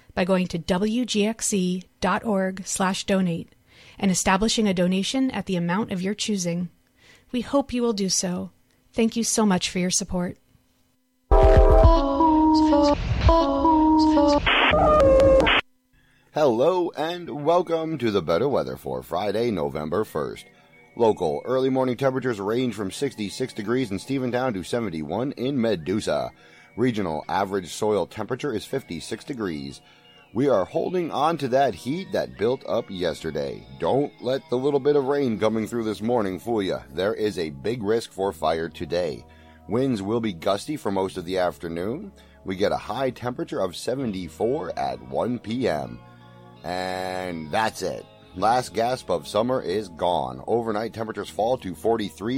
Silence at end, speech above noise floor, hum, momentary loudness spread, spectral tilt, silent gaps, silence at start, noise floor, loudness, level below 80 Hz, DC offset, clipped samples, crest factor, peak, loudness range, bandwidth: 0 s; 43 dB; none; 12 LU; -5 dB/octave; none; 0.15 s; -67 dBFS; -24 LUFS; -34 dBFS; under 0.1%; under 0.1%; 18 dB; -4 dBFS; 9 LU; 16.5 kHz